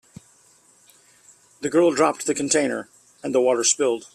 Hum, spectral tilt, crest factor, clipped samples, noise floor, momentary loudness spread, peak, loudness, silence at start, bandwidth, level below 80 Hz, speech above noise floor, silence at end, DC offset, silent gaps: none; -2.5 dB/octave; 18 dB; under 0.1%; -56 dBFS; 12 LU; -6 dBFS; -21 LUFS; 1.6 s; 15 kHz; -68 dBFS; 36 dB; 0.1 s; under 0.1%; none